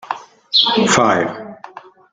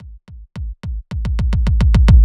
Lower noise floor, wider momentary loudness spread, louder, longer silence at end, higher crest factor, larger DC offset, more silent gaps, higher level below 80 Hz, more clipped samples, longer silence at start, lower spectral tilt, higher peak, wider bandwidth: about the same, -38 dBFS vs -37 dBFS; about the same, 18 LU vs 18 LU; first, -14 LUFS vs -17 LUFS; first, 0.35 s vs 0 s; about the same, 18 dB vs 14 dB; neither; neither; second, -56 dBFS vs -16 dBFS; neither; about the same, 0.05 s vs 0 s; second, -3 dB/octave vs -8 dB/octave; about the same, 0 dBFS vs 0 dBFS; first, 9.6 kHz vs 7.6 kHz